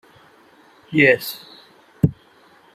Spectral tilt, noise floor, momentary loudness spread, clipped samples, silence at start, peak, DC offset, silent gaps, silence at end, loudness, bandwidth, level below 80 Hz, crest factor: -6.5 dB/octave; -52 dBFS; 15 LU; under 0.1%; 0.9 s; -2 dBFS; under 0.1%; none; 0.6 s; -19 LUFS; 15 kHz; -52 dBFS; 22 dB